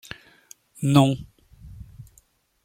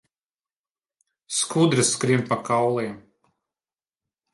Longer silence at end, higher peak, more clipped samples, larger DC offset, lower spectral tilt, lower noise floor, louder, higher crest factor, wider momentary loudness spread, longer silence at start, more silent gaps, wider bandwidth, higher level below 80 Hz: second, 0.65 s vs 1.35 s; first, -2 dBFS vs -6 dBFS; neither; neither; first, -6.5 dB/octave vs -4 dB/octave; second, -61 dBFS vs under -90 dBFS; about the same, -21 LUFS vs -22 LUFS; about the same, 24 dB vs 20 dB; first, 27 LU vs 9 LU; second, 0.8 s vs 1.3 s; neither; first, 16 kHz vs 11.5 kHz; first, -52 dBFS vs -66 dBFS